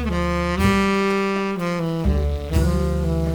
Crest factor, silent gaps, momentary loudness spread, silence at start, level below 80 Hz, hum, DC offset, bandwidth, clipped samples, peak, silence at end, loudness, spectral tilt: 16 dB; none; 5 LU; 0 s; -26 dBFS; none; under 0.1%; 19.5 kHz; under 0.1%; -4 dBFS; 0 s; -21 LUFS; -6.5 dB/octave